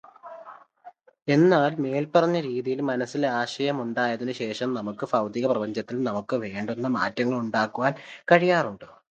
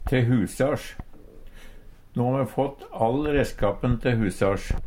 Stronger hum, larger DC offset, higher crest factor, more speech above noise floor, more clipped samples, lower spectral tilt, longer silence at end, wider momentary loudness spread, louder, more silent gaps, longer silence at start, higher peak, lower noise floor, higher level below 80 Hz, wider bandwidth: neither; neither; first, 24 dB vs 18 dB; first, 26 dB vs 20 dB; neither; about the same, -6.5 dB/octave vs -7 dB/octave; first, 0.25 s vs 0 s; first, 11 LU vs 8 LU; about the same, -25 LUFS vs -25 LUFS; neither; first, 0.25 s vs 0 s; first, -2 dBFS vs -8 dBFS; first, -51 dBFS vs -44 dBFS; second, -70 dBFS vs -36 dBFS; second, 8.8 kHz vs 16 kHz